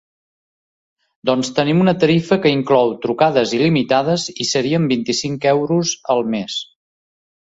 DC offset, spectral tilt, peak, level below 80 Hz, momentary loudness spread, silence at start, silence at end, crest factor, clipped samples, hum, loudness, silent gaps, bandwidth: under 0.1%; -5 dB/octave; -2 dBFS; -56 dBFS; 6 LU; 1.25 s; 0.85 s; 16 dB; under 0.1%; none; -17 LUFS; none; 8 kHz